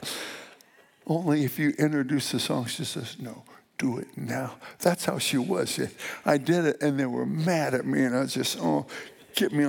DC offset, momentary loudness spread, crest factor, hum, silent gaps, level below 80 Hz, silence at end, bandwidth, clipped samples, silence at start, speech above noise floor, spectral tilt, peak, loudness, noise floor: under 0.1%; 13 LU; 18 dB; none; none; -74 dBFS; 0 s; 19 kHz; under 0.1%; 0 s; 31 dB; -5 dB/octave; -8 dBFS; -27 LUFS; -58 dBFS